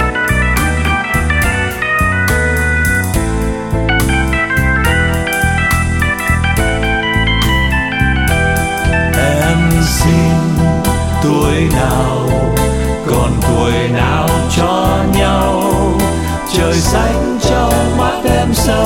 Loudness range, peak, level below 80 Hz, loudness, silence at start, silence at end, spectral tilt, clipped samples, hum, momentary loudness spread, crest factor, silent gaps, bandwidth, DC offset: 1 LU; 0 dBFS; -20 dBFS; -13 LUFS; 0 s; 0 s; -5 dB/octave; under 0.1%; none; 3 LU; 12 dB; none; 19 kHz; under 0.1%